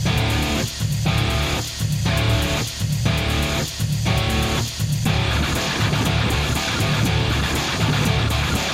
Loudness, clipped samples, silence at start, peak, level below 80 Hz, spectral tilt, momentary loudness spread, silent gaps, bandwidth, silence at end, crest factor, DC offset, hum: -20 LUFS; under 0.1%; 0 s; -6 dBFS; -30 dBFS; -4.5 dB/octave; 3 LU; none; 16.5 kHz; 0 s; 14 dB; under 0.1%; none